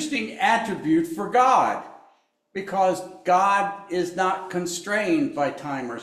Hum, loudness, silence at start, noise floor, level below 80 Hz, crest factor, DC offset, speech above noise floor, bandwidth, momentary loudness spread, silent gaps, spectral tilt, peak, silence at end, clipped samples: none; -23 LUFS; 0 s; -61 dBFS; -66 dBFS; 16 dB; under 0.1%; 38 dB; 15 kHz; 10 LU; none; -4.5 dB/octave; -8 dBFS; 0 s; under 0.1%